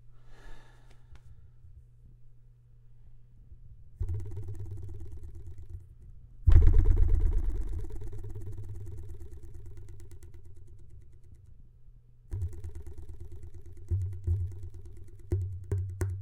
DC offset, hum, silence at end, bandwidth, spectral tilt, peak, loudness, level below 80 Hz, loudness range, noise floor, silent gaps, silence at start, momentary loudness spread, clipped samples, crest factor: under 0.1%; none; 0 s; 2.4 kHz; -8.5 dB/octave; -4 dBFS; -33 LUFS; -34 dBFS; 17 LU; -55 dBFS; none; 0.05 s; 27 LU; under 0.1%; 26 dB